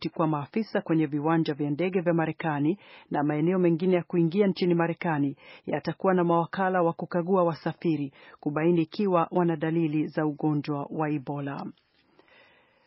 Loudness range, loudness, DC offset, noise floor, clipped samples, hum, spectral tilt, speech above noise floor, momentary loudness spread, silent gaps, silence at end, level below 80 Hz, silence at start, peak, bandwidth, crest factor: 2 LU; -27 LUFS; under 0.1%; -62 dBFS; under 0.1%; none; -7 dB/octave; 35 dB; 8 LU; none; 1.15 s; -74 dBFS; 0 s; -8 dBFS; 5.8 kHz; 18 dB